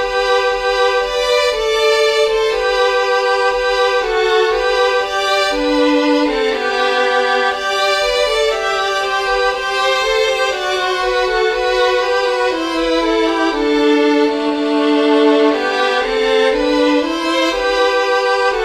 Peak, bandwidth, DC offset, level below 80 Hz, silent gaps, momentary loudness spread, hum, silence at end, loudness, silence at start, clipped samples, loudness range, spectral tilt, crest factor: -2 dBFS; 14.5 kHz; under 0.1%; -42 dBFS; none; 3 LU; none; 0 s; -14 LUFS; 0 s; under 0.1%; 1 LU; -2 dB/octave; 12 dB